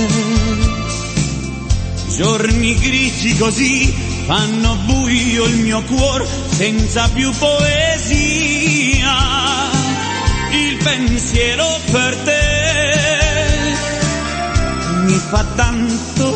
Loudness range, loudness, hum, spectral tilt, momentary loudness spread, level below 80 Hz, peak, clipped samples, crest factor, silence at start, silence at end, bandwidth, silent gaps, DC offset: 2 LU; -15 LUFS; none; -4 dB/octave; 5 LU; -22 dBFS; 0 dBFS; under 0.1%; 14 dB; 0 s; 0 s; 8.8 kHz; none; under 0.1%